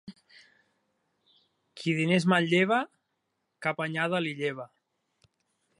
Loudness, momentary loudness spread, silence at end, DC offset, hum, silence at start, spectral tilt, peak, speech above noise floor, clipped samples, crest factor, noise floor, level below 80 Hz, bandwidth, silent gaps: -27 LUFS; 13 LU; 1.15 s; under 0.1%; none; 0.05 s; -6 dB/octave; -10 dBFS; 53 dB; under 0.1%; 22 dB; -80 dBFS; -76 dBFS; 11.5 kHz; none